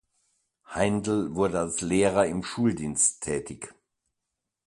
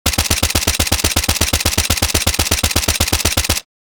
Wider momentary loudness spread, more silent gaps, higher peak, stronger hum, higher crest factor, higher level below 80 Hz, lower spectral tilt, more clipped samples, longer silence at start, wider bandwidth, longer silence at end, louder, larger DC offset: first, 14 LU vs 1 LU; neither; second, -8 dBFS vs 0 dBFS; neither; about the same, 20 dB vs 16 dB; second, -54 dBFS vs -26 dBFS; first, -4.5 dB/octave vs -2.5 dB/octave; neither; first, 0.7 s vs 0.05 s; second, 11.5 kHz vs over 20 kHz; first, 0.95 s vs 0.25 s; second, -26 LUFS vs -15 LUFS; second, under 0.1% vs 0.1%